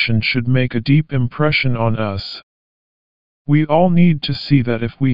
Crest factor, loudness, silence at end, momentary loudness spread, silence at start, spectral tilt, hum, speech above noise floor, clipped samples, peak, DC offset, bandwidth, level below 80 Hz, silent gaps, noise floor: 14 dB; -16 LUFS; 0 s; 9 LU; 0 s; -9 dB/octave; none; over 75 dB; under 0.1%; -2 dBFS; 3%; 5.4 kHz; -44 dBFS; 2.43-3.45 s; under -90 dBFS